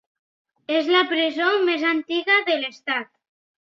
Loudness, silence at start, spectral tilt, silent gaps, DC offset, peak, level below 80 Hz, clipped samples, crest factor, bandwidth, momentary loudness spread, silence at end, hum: -21 LUFS; 0.7 s; -2.5 dB/octave; none; under 0.1%; -4 dBFS; -76 dBFS; under 0.1%; 18 dB; 7 kHz; 8 LU; 0.65 s; none